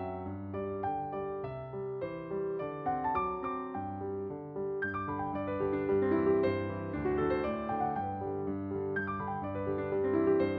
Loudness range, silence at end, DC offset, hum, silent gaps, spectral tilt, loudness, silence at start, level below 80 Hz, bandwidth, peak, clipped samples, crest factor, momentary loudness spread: 4 LU; 0 s; under 0.1%; none; none; -7 dB/octave; -34 LUFS; 0 s; -58 dBFS; 4.6 kHz; -18 dBFS; under 0.1%; 16 dB; 10 LU